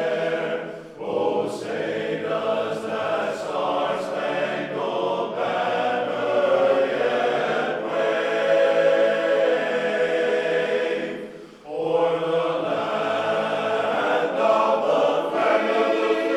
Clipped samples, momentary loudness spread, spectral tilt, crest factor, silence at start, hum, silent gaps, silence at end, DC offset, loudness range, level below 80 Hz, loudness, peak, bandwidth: under 0.1%; 7 LU; -5 dB/octave; 16 dB; 0 s; none; none; 0 s; under 0.1%; 4 LU; -68 dBFS; -23 LUFS; -8 dBFS; 11.5 kHz